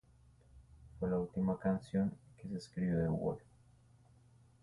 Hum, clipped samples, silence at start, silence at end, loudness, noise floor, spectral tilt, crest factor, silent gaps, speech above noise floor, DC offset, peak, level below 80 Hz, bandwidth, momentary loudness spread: none; under 0.1%; 0.55 s; 1.25 s; -38 LUFS; -65 dBFS; -9 dB/octave; 16 dB; none; 29 dB; under 0.1%; -24 dBFS; -60 dBFS; 11.5 kHz; 11 LU